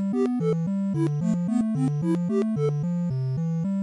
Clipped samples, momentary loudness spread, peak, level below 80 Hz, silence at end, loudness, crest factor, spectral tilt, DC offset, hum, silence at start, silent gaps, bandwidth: under 0.1%; 3 LU; -12 dBFS; -62 dBFS; 0 s; -25 LUFS; 12 dB; -9.5 dB/octave; under 0.1%; none; 0 s; none; 11 kHz